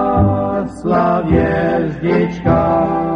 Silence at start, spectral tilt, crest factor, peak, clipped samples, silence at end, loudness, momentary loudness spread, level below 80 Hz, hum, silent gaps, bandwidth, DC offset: 0 s; -9 dB/octave; 14 dB; 0 dBFS; under 0.1%; 0 s; -15 LUFS; 4 LU; -32 dBFS; none; none; 9.4 kHz; under 0.1%